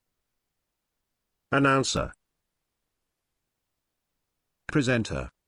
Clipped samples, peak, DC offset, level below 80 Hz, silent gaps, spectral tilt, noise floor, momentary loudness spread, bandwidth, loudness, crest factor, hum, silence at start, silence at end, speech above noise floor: under 0.1%; -8 dBFS; under 0.1%; -50 dBFS; none; -5 dB/octave; -82 dBFS; 13 LU; 11 kHz; -26 LUFS; 24 dB; none; 1.5 s; 0.2 s; 58 dB